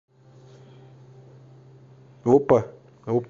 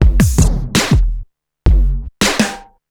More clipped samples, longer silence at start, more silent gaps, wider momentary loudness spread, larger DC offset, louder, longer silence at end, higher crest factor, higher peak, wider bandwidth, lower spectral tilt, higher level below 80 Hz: neither; first, 2.25 s vs 0 s; neither; first, 22 LU vs 9 LU; neither; second, -21 LUFS vs -15 LUFS; second, 0.05 s vs 0.3 s; first, 22 dB vs 14 dB; second, -4 dBFS vs 0 dBFS; second, 7.4 kHz vs 18 kHz; first, -9 dB/octave vs -4.5 dB/octave; second, -62 dBFS vs -16 dBFS